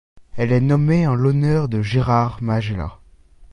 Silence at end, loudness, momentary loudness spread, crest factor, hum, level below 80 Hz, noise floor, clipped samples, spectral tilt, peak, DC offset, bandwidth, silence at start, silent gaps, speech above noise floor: 0.05 s; -19 LUFS; 10 LU; 14 dB; none; -40 dBFS; -46 dBFS; under 0.1%; -8.5 dB/octave; -4 dBFS; under 0.1%; 9.8 kHz; 0.15 s; none; 29 dB